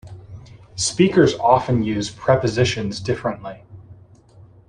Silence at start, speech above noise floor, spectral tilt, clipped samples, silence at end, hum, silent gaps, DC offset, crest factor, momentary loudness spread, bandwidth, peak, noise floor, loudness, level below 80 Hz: 0.05 s; 29 dB; -5 dB/octave; under 0.1%; 0.75 s; none; none; under 0.1%; 18 dB; 20 LU; 11 kHz; -2 dBFS; -47 dBFS; -19 LUFS; -48 dBFS